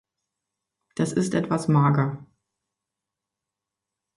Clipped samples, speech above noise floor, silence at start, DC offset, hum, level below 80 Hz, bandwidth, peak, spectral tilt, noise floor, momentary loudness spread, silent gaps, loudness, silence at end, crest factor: under 0.1%; 64 dB; 1 s; under 0.1%; none; -62 dBFS; 11.5 kHz; -8 dBFS; -7 dB/octave; -86 dBFS; 13 LU; none; -23 LUFS; 1.9 s; 20 dB